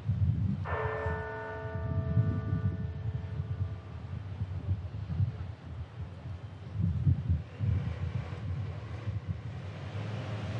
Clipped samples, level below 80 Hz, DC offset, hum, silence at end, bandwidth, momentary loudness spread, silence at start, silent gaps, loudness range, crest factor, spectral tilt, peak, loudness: under 0.1%; -48 dBFS; under 0.1%; none; 0 s; 6.4 kHz; 12 LU; 0 s; none; 4 LU; 18 dB; -9 dB/octave; -16 dBFS; -35 LUFS